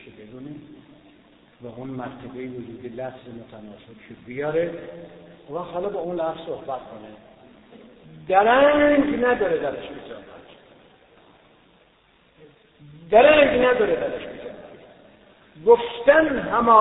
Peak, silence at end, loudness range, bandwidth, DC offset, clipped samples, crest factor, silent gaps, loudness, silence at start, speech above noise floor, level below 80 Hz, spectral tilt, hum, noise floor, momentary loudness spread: -2 dBFS; 0 s; 16 LU; 4 kHz; under 0.1%; under 0.1%; 22 dB; none; -20 LUFS; 0.05 s; 38 dB; -54 dBFS; -9.5 dB/octave; none; -59 dBFS; 25 LU